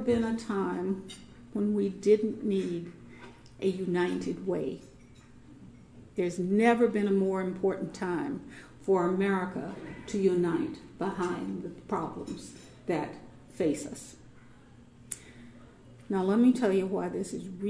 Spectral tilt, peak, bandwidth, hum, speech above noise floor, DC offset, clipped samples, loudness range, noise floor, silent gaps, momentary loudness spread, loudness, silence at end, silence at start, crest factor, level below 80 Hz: -6.5 dB/octave; -10 dBFS; 11 kHz; none; 25 dB; under 0.1%; under 0.1%; 7 LU; -54 dBFS; none; 17 LU; -30 LUFS; 0 s; 0 s; 20 dB; -60 dBFS